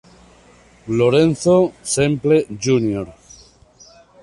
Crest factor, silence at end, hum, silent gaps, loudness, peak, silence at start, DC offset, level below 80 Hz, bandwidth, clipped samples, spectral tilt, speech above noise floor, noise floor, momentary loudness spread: 16 dB; 1.1 s; none; none; -17 LUFS; -2 dBFS; 0.85 s; under 0.1%; -50 dBFS; 11.5 kHz; under 0.1%; -5.5 dB/octave; 33 dB; -49 dBFS; 11 LU